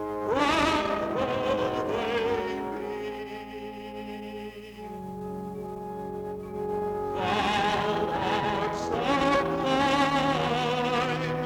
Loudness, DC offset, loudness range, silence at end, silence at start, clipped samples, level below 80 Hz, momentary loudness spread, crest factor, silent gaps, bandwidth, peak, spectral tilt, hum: -28 LUFS; under 0.1%; 11 LU; 0 s; 0 s; under 0.1%; -52 dBFS; 14 LU; 20 dB; none; over 20 kHz; -10 dBFS; -5 dB/octave; none